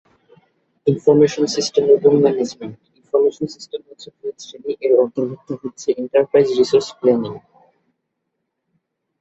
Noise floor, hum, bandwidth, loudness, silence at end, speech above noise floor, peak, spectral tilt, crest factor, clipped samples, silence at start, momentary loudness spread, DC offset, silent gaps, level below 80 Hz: -75 dBFS; none; 8.2 kHz; -17 LUFS; 1.8 s; 58 dB; -2 dBFS; -5.5 dB/octave; 16 dB; under 0.1%; 0.85 s; 18 LU; under 0.1%; none; -62 dBFS